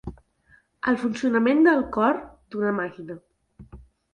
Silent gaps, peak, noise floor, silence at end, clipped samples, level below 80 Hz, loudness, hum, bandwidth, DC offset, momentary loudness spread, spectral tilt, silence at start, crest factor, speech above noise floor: none; -6 dBFS; -60 dBFS; 0.35 s; under 0.1%; -52 dBFS; -23 LUFS; none; 10 kHz; under 0.1%; 21 LU; -6.5 dB/octave; 0.05 s; 18 dB; 38 dB